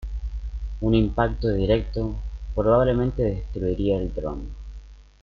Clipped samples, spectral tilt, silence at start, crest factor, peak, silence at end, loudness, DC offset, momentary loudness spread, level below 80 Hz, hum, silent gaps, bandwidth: under 0.1%; -9 dB/octave; 0 s; 18 dB; -6 dBFS; 0.2 s; -24 LUFS; under 0.1%; 15 LU; -32 dBFS; 50 Hz at -30 dBFS; none; 6.6 kHz